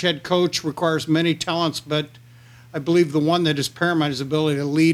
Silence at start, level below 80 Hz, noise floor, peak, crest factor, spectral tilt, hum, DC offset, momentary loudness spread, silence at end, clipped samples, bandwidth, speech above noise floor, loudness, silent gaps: 0 s; -60 dBFS; -47 dBFS; -6 dBFS; 16 dB; -5.5 dB/octave; none; under 0.1%; 7 LU; 0 s; under 0.1%; 15 kHz; 26 dB; -21 LUFS; none